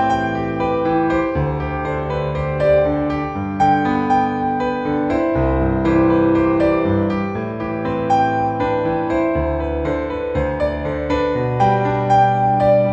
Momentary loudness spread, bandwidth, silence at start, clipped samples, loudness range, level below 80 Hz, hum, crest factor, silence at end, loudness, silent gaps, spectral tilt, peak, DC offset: 7 LU; 8 kHz; 0 s; under 0.1%; 2 LU; -32 dBFS; none; 14 dB; 0 s; -18 LUFS; none; -8.5 dB/octave; -4 dBFS; under 0.1%